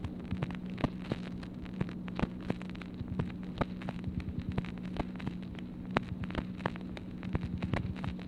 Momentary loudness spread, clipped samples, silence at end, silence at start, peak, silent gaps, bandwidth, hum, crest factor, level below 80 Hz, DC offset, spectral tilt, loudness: 6 LU; under 0.1%; 0 s; 0 s; -8 dBFS; none; 10.5 kHz; none; 30 dB; -48 dBFS; under 0.1%; -8 dB/octave; -39 LUFS